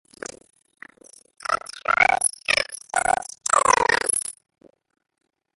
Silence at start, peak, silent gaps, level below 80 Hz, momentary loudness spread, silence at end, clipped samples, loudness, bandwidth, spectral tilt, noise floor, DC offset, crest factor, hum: 1.5 s; -4 dBFS; none; -56 dBFS; 16 LU; 1.25 s; under 0.1%; -21 LUFS; 12 kHz; 0 dB/octave; -50 dBFS; under 0.1%; 22 dB; none